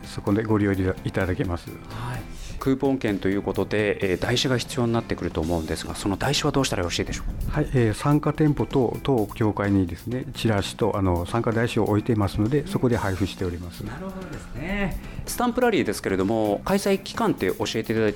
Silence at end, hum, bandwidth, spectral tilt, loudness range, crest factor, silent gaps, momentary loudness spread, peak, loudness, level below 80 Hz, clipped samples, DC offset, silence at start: 0 s; none; 19.5 kHz; -6 dB/octave; 3 LU; 14 dB; none; 10 LU; -10 dBFS; -24 LUFS; -40 dBFS; under 0.1%; under 0.1%; 0 s